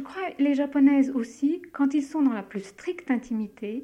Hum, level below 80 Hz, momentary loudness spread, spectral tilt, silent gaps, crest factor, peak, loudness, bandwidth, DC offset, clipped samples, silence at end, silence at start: none; -66 dBFS; 14 LU; -6 dB/octave; none; 14 dB; -10 dBFS; -26 LUFS; 9 kHz; under 0.1%; under 0.1%; 0 s; 0 s